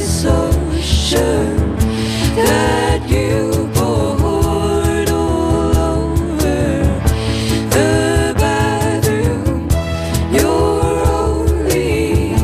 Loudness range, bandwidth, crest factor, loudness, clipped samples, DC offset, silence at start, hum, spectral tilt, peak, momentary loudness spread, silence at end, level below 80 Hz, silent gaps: 1 LU; 15 kHz; 12 dB; -15 LUFS; under 0.1%; under 0.1%; 0 s; none; -5.5 dB/octave; -2 dBFS; 3 LU; 0 s; -22 dBFS; none